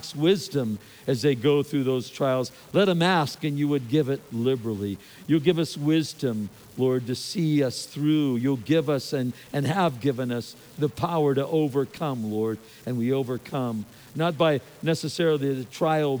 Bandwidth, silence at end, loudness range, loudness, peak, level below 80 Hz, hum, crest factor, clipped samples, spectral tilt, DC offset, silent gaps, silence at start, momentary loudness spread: over 20 kHz; 0 s; 3 LU; -25 LUFS; -8 dBFS; -66 dBFS; none; 18 dB; under 0.1%; -6.5 dB/octave; under 0.1%; none; 0 s; 8 LU